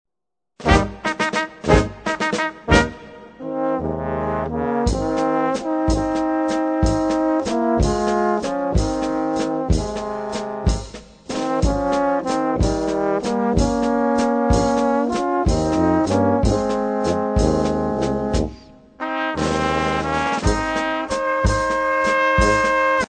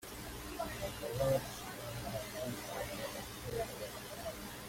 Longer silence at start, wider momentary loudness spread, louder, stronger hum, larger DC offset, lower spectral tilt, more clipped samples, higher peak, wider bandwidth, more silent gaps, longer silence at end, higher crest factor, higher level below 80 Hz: first, 0.6 s vs 0 s; about the same, 7 LU vs 9 LU; first, -20 LUFS vs -41 LUFS; second, none vs 60 Hz at -55 dBFS; neither; first, -5.5 dB/octave vs -4 dB/octave; neither; first, 0 dBFS vs -22 dBFS; second, 9.4 kHz vs 16.5 kHz; neither; about the same, 0 s vs 0 s; about the same, 20 dB vs 20 dB; first, -30 dBFS vs -56 dBFS